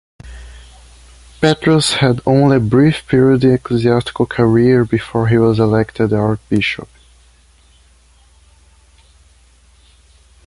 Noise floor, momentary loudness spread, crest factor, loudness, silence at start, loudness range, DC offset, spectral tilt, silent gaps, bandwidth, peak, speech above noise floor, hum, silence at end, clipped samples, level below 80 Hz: -49 dBFS; 6 LU; 14 dB; -14 LUFS; 0.25 s; 9 LU; under 0.1%; -6.5 dB/octave; none; 11.5 kHz; -2 dBFS; 36 dB; none; 3.65 s; under 0.1%; -40 dBFS